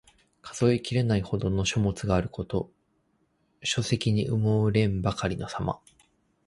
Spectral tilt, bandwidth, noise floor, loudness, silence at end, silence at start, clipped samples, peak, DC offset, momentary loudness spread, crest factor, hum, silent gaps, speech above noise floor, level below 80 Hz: -6 dB/octave; 11.5 kHz; -70 dBFS; -27 LUFS; 0.7 s; 0.45 s; under 0.1%; -10 dBFS; under 0.1%; 9 LU; 18 dB; none; none; 44 dB; -46 dBFS